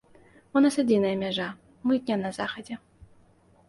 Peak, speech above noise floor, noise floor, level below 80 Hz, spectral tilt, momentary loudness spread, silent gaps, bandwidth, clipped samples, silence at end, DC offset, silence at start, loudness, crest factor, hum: -10 dBFS; 34 dB; -59 dBFS; -64 dBFS; -5.5 dB/octave; 15 LU; none; 11.5 kHz; under 0.1%; 0.9 s; under 0.1%; 0.55 s; -26 LUFS; 18 dB; none